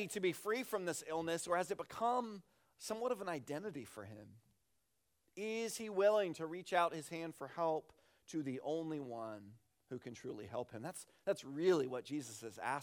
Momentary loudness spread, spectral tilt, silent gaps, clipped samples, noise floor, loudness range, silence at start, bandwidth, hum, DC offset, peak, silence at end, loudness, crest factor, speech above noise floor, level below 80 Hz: 15 LU; -4.5 dB/octave; none; under 0.1%; -84 dBFS; 7 LU; 0 s; 19 kHz; none; under 0.1%; -20 dBFS; 0 s; -41 LUFS; 20 dB; 43 dB; -82 dBFS